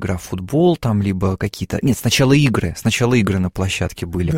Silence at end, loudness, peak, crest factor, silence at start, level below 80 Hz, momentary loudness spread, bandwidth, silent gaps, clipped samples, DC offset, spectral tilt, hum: 0 s; -18 LUFS; 0 dBFS; 16 dB; 0 s; -38 dBFS; 9 LU; 16.5 kHz; none; under 0.1%; under 0.1%; -5.5 dB/octave; none